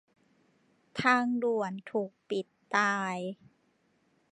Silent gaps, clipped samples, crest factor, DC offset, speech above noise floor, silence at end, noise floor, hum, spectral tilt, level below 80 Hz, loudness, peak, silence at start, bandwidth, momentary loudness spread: none; under 0.1%; 22 dB; under 0.1%; 41 dB; 0.95 s; -71 dBFS; none; -5 dB/octave; -76 dBFS; -31 LUFS; -10 dBFS; 0.95 s; 11 kHz; 13 LU